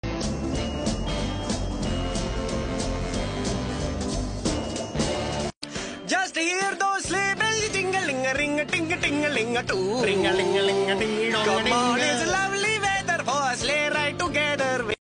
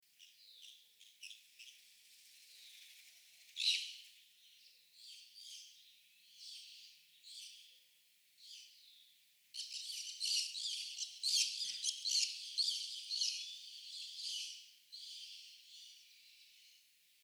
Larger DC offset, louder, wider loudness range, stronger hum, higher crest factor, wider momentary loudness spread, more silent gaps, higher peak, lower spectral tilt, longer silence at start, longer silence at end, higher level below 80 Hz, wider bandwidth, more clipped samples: neither; first, -25 LUFS vs -39 LUFS; second, 6 LU vs 19 LU; neither; second, 16 dB vs 26 dB; second, 7 LU vs 26 LU; first, 5.57-5.61 s vs none; first, -10 dBFS vs -20 dBFS; first, -3.5 dB/octave vs 7 dB/octave; second, 0.05 s vs 0.2 s; second, 0.1 s vs 0.45 s; first, -38 dBFS vs under -90 dBFS; second, 10.5 kHz vs over 20 kHz; neither